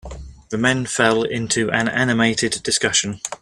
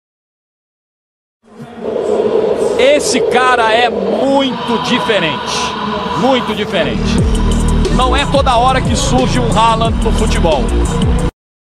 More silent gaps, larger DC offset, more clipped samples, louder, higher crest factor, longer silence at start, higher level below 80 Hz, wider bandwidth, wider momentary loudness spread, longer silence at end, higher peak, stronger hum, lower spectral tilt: neither; neither; neither; second, -19 LUFS vs -13 LUFS; first, 20 dB vs 12 dB; second, 0.05 s vs 1.55 s; second, -44 dBFS vs -20 dBFS; about the same, 13.5 kHz vs 13 kHz; first, 10 LU vs 6 LU; second, 0.05 s vs 0.5 s; about the same, 0 dBFS vs 0 dBFS; neither; second, -3 dB/octave vs -5 dB/octave